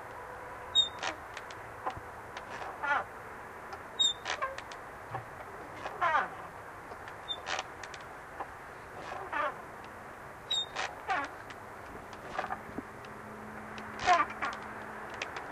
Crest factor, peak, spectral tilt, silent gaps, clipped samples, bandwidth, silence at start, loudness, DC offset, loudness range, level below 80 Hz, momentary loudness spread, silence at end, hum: 24 dB; -14 dBFS; -2 dB/octave; none; under 0.1%; 15.5 kHz; 0 s; -36 LUFS; under 0.1%; 5 LU; -62 dBFS; 17 LU; 0 s; none